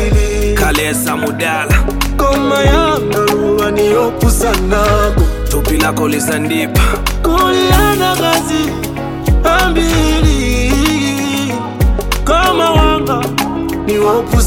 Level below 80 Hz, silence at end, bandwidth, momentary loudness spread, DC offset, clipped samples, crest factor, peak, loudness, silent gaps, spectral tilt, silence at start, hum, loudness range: -18 dBFS; 0 s; 17 kHz; 5 LU; under 0.1%; under 0.1%; 12 dB; 0 dBFS; -13 LUFS; none; -5 dB/octave; 0 s; none; 1 LU